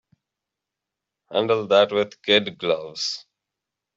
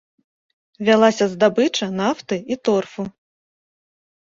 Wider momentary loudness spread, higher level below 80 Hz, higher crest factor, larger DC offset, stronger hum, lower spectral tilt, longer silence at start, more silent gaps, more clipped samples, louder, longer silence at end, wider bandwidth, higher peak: second, 9 LU vs 13 LU; about the same, -68 dBFS vs -64 dBFS; about the same, 22 dB vs 20 dB; neither; neither; second, -3.5 dB/octave vs -5 dB/octave; first, 1.3 s vs 0.8 s; neither; neither; second, -22 LUFS vs -19 LUFS; second, 0.75 s vs 1.2 s; about the same, 8 kHz vs 7.8 kHz; about the same, -4 dBFS vs -2 dBFS